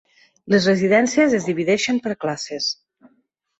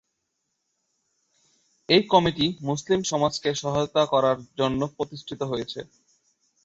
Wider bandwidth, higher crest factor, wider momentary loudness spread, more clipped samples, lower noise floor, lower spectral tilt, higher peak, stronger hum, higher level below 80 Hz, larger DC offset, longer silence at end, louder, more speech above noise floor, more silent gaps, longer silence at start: about the same, 8.2 kHz vs 8 kHz; second, 16 dB vs 22 dB; second, 9 LU vs 12 LU; neither; second, -65 dBFS vs -78 dBFS; about the same, -4.5 dB/octave vs -4.5 dB/octave; about the same, -4 dBFS vs -4 dBFS; neither; about the same, -60 dBFS vs -56 dBFS; neither; about the same, 0.85 s vs 0.8 s; first, -19 LUFS vs -24 LUFS; second, 46 dB vs 54 dB; neither; second, 0.45 s vs 1.9 s